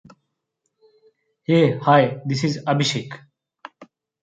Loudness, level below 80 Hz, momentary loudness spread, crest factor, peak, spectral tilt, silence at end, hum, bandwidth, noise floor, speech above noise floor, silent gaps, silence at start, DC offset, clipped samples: -19 LUFS; -64 dBFS; 18 LU; 20 dB; -4 dBFS; -6 dB/octave; 0.4 s; none; 9.2 kHz; -76 dBFS; 57 dB; none; 1.5 s; under 0.1%; under 0.1%